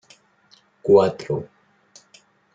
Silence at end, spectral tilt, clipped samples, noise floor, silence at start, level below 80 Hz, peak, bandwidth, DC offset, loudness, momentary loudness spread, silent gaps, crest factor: 1.1 s; -7 dB/octave; under 0.1%; -58 dBFS; 0.85 s; -64 dBFS; -2 dBFS; 7.8 kHz; under 0.1%; -20 LUFS; 15 LU; none; 20 dB